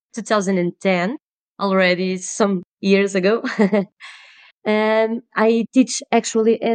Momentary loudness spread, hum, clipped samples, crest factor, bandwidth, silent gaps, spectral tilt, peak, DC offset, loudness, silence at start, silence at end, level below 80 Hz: 9 LU; none; under 0.1%; 16 dB; 9.6 kHz; 1.22-1.55 s, 2.65-2.78 s, 4.52-4.62 s; -5 dB/octave; -2 dBFS; under 0.1%; -19 LUFS; 0.15 s; 0 s; -78 dBFS